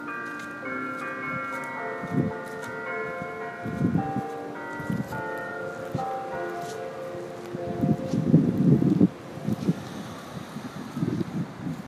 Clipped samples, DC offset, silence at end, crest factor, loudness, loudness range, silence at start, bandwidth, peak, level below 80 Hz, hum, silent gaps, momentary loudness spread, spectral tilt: under 0.1%; under 0.1%; 0 s; 24 dB; -29 LUFS; 7 LU; 0 s; 15 kHz; -4 dBFS; -58 dBFS; none; none; 14 LU; -8 dB/octave